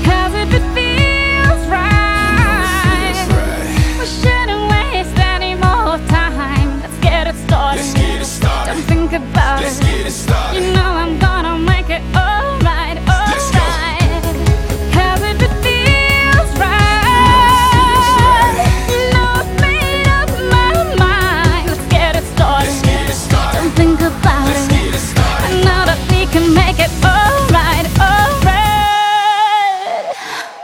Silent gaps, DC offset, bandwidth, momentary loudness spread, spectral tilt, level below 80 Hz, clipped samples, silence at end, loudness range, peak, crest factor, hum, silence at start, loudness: none; under 0.1%; 16.5 kHz; 6 LU; -5 dB/octave; -18 dBFS; under 0.1%; 0 s; 5 LU; 0 dBFS; 12 dB; none; 0 s; -13 LUFS